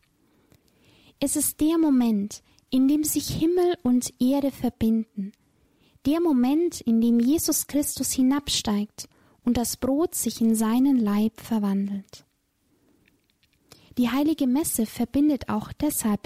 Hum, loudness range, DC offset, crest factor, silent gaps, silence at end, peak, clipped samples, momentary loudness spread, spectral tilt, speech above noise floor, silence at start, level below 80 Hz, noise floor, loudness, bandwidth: none; 5 LU; under 0.1%; 12 dB; none; 0.1 s; -12 dBFS; under 0.1%; 9 LU; -4.5 dB/octave; 46 dB; 1.2 s; -52 dBFS; -69 dBFS; -24 LUFS; 16 kHz